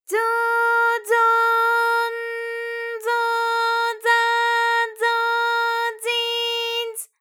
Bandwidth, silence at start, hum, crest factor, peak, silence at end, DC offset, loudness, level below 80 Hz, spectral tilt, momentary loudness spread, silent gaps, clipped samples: 19.5 kHz; 0.1 s; none; 14 dB; -6 dBFS; 0.15 s; under 0.1%; -20 LUFS; under -90 dBFS; 3.5 dB/octave; 9 LU; none; under 0.1%